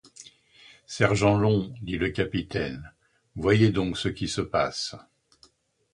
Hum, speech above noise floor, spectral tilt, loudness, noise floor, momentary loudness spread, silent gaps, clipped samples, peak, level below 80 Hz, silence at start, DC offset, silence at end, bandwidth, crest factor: none; 36 dB; -6 dB/octave; -26 LUFS; -61 dBFS; 13 LU; none; under 0.1%; -6 dBFS; -48 dBFS; 0.2 s; under 0.1%; 0.95 s; 11 kHz; 22 dB